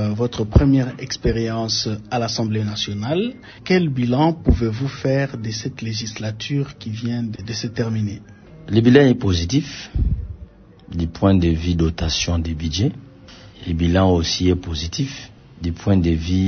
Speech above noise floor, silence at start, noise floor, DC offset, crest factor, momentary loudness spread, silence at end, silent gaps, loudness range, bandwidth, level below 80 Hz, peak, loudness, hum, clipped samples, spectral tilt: 23 dB; 0 s; -42 dBFS; under 0.1%; 20 dB; 11 LU; 0 s; none; 4 LU; 6.6 kHz; -32 dBFS; 0 dBFS; -20 LUFS; none; under 0.1%; -6 dB/octave